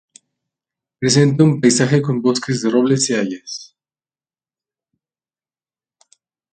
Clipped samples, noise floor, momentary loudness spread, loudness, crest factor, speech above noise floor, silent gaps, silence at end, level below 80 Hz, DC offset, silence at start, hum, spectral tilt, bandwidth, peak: under 0.1%; under -90 dBFS; 12 LU; -16 LUFS; 18 dB; over 75 dB; none; 2.9 s; -60 dBFS; under 0.1%; 1 s; none; -5 dB/octave; 9.4 kHz; 0 dBFS